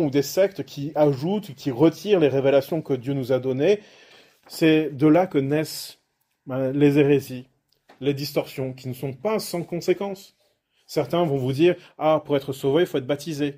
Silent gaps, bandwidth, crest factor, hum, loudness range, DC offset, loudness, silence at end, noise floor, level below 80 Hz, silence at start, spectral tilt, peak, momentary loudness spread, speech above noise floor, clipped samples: none; 16 kHz; 18 dB; none; 6 LU; under 0.1%; -23 LUFS; 0.05 s; -67 dBFS; -64 dBFS; 0 s; -6.5 dB/octave; -4 dBFS; 12 LU; 45 dB; under 0.1%